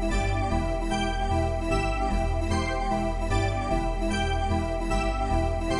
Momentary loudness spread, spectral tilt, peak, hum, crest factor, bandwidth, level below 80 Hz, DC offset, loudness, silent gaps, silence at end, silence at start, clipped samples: 1 LU; -6 dB/octave; -12 dBFS; none; 12 dB; 11.5 kHz; -30 dBFS; under 0.1%; -27 LUFS; none; 0 s; 0 s; under 0.1%